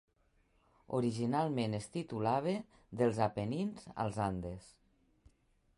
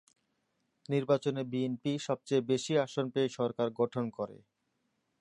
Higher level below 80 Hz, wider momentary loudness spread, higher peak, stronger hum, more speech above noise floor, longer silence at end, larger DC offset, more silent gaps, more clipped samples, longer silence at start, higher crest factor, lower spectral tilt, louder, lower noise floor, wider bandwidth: first, -62 dBFS vs -78 dBFS; about the same, 8 LU vs 6 LU; about the same, -18 dBFS vs -16 dBFS; neither; second, 37 dB vs 47 dB; first, 1.1 s vs 0.85 s; neither; neither; neither; about the same, 0.9 s vs 0.9 s; about the same, 20 dB vs 18 dB; about the same, -7 dB/octave vs -6 dB/octave; second, -36 LUFS vs -33 LUFS; second, -73 dBFS vs -80 dBFS; about the same, 11.5 kHz vs 11 kHz